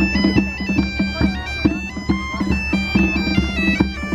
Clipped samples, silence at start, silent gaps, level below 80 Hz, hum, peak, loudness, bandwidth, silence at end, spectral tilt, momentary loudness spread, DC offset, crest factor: under 0.1%; 0 s; none; -28 dBFS; none; -2 dBFS; -19 LUFS; 10.5 kHz; 0 s; -6 dB/octave; 4 LU; under 0.1%; 18 dB